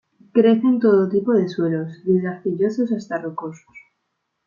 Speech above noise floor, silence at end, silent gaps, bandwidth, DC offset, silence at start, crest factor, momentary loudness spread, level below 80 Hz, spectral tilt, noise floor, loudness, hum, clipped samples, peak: 56 dB; 0.65 s; none; 7.2 kHz; under 0.1%; 0.35 s; 16 dB; 11 LU; -68 dBFS; -8.5 dB/octave; -75 dBFS; -20 LUFS; none; under 0.1%; -4 dBFS